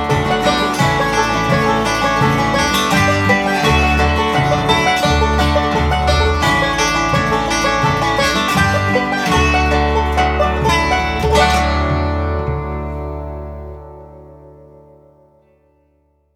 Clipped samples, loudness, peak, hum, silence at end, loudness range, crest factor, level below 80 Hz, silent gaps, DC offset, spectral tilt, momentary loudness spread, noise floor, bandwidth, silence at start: under 0.1%; -15 LUFS; -2 dBFS; none; 1.85 s; 10 LU; 14 dB; -24 dBFS; none; under 0.1%; -4.5 dB/octave; 8 LU; -59 dBFS; 16 kHz; 0 s